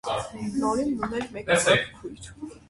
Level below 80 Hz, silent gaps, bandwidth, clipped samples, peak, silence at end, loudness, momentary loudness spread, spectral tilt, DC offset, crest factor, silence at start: -52 dBFS; none; 11.5 kHz; under 0.1%; -6 dBFS; 0.1 s; -25 LUFS; 20 LU; -3.5 dB/octave; under 0.1%; 20 dB; 0.05 s